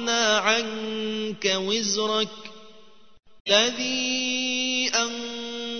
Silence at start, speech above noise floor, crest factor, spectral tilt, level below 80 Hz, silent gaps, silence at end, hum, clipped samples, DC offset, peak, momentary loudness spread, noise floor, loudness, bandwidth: 0 s; 29 dB; 22 dB; -1.5 dB/octave; -66 dBFS; 3.40-3.45 s; 0 s; none; under 0.1%; 0.4%; -4 dBFS; 12 LU; -54 dBFS; -23 LUFS; 6.6 kHz